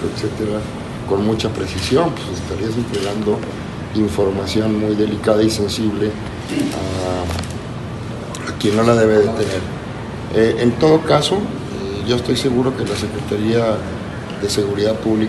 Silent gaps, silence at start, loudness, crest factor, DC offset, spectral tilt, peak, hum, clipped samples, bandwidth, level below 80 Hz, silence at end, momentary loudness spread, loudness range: none; 0 s; -19 LUFS; 18 dB; under 0.1%; -6 dB/octave; 0 dBFS; none; under 0.1%; 12.5 kHz; -40 dBFS; 0 s; 13 LU; 4 LU